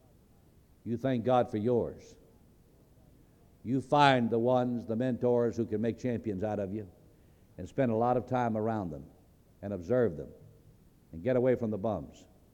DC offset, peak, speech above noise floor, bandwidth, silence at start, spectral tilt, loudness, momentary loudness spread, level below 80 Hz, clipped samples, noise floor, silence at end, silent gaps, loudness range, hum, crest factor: under 0.1%; -8 dBFS; 31 dB; 9.6 kHz; 0.85 s; -7.5 dB/octave; -31 LUFS; 17 LU; -62 dBFS; under 0.1%; -61 dBFS; 0.45 s; none; 5 LU; none; 24 dB